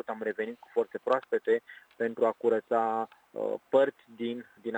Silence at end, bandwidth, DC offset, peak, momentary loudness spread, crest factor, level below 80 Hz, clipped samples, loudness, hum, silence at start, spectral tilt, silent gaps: 0 s; 19 kHz; under 0.1%; -12 dBFS; 10 LU; 18 dB; -84 dBFS; under 0.1%; -31 LUFS; none; 0.1 s; -6.5 dB/octave; none